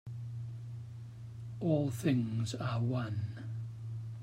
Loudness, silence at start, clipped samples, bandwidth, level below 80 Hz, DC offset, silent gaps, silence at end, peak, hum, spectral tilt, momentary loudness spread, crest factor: -37 LUFS; 0.05 s; under 0.1%; 15.5 kHz; -66 dBFS; under 0.1%; none; 0 s; -20 dBFS; none; -7.5 dB/octave; 14 LU; 16 dB